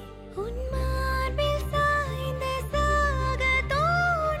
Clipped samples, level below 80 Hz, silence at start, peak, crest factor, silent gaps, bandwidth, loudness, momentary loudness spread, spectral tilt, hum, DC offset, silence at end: under 0.1%; -32 dBFS; 0 s; -14 dBFS; 12 dB; none; 15.5 kHz; -26 LUFS; 8 LU; -5 dB/octave; none; under 0.1%; 0 s